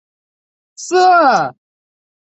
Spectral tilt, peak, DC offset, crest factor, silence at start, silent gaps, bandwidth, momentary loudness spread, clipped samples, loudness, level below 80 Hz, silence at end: -3.5 dB/octave; -2 dBFS; under 0.1%; 14 dB; 0.8 s; none; 8.4 kHz; 15 LU; under 0.1%; -12 LUFS; -66 dBFS; 0.8 s